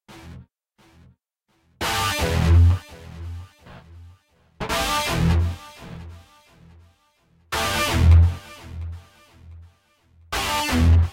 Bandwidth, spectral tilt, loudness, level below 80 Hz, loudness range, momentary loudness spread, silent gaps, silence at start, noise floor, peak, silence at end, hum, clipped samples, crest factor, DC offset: 16 kHz; -5 dB/octave; -20 LUFS; -28 dBFS; 4 LU; 24 LU; none; 0.1 s; -68 dBFS; -6 dBFS; 0 s; none; under 0.1%; 18 dB; under 0.1%